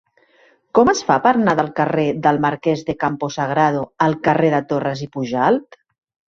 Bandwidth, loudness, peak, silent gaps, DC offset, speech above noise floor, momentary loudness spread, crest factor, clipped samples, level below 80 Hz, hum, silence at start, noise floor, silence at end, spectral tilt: 7.8 kHz; -18 LUFS; -2 dBFS; none; under 0.1%; 38 dB; 7 LU; 16 dB; under 0.1%; -54 dBFS; none; 0.75 s; -55 dBFS; 0.65 s; -6 dB/octave